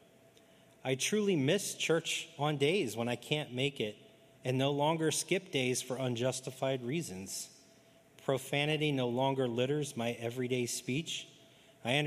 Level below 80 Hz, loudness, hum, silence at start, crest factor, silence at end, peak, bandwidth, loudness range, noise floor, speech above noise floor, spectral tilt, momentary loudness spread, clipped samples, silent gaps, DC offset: -78 dBFS; -34 LUFS; none; 0.85 s; 20 dB; 0 s; -14 dBFS; 15 kHz; 3 LU; -63 dBFS; 29 dB; -4 dB/octave; 9 LU; under 0.1%; none; under 0.1%